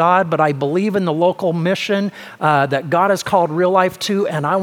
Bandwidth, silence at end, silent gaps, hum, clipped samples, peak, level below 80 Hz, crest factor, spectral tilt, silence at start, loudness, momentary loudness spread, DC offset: 18 kHz; 0 s; none; none; under 0.1%; 0 dBFS; -62 dBFS; 16 dB; -6 dB/octave; 0 s; -17 LUFS; 4 LU; under 0.1%